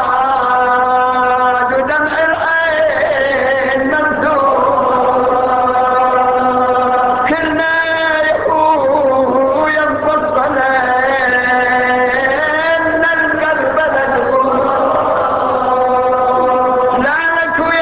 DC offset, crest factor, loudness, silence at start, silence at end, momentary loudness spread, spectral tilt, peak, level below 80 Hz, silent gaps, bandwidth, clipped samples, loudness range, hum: under 0.1%; 10 dB; -12 LUFS; 0 s; 0 s; 2 LU; -8 dB/octave; -2 dBFS; -44 dBFS; none; 4 kHz; under 0.1%; 1 LU; none